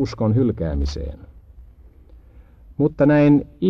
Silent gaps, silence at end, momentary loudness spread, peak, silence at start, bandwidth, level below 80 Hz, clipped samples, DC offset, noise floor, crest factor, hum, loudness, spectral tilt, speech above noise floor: none; 0 s; 17 LU; -4 dBFS; 0 s; 7 kHz; -34 dBFS; under 0.1%; under 0.1%; -46 dBFS; 16 dB; none; -19 LUFS; -8.5 dB/octave; 28 dB